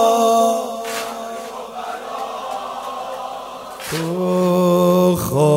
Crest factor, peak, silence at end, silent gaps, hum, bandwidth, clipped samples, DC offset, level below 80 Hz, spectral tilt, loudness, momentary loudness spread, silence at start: 16 dB; -4 dBFS; 0 s; none; none; 16.5 kHz; under 0.1%; under 0.1%; -52 dBFS; -6 dB/octave; -19 LUFS; 15 LU; 0 s